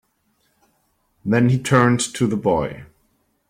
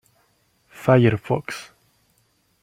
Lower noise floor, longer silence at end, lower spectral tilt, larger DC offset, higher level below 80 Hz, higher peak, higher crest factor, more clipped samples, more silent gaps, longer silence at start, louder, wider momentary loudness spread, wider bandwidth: about the same, -66 dBFS vs -65 dBFS; second, 0.65 s vs 1 s; second, -5.5 dB/octave vs -7.5 dB/octave; neither; first, -52 dBFS vs -58 dBFS; about the same, -2 dBFS vs -4 dBFS; about the same, 20 dB vs 20 dB; neither; neither; first, 1.25 s vs 0.8 s; about the same, -19 LUFS vs -20 LUFS; second, 14 LU vs 17 LU; about the same, 14.5 kHz vs 14.5 kHz